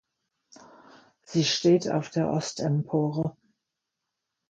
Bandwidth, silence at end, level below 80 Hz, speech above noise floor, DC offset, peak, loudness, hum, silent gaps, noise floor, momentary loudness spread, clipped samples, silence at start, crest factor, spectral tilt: 9 kHz; 1.2 s; -66 dBFS; 59 dB; under 0.1%; -10 dBFS; -26 LUFS; none; none; -84 dBFS; 8 LU; under 0.1%; 1.3 s; 18 dB; -5.5 dB/octave